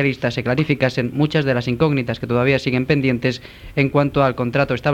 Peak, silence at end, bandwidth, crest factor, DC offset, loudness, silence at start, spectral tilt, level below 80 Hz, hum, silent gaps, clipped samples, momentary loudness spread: -2 dBFS; 0 s; 9 kHz; 16 dB; under 0.1%; -19 LUFS; 0 s; -7.5 dB/octave; -44 dBFS; none; none; under 0.1%; 5 LU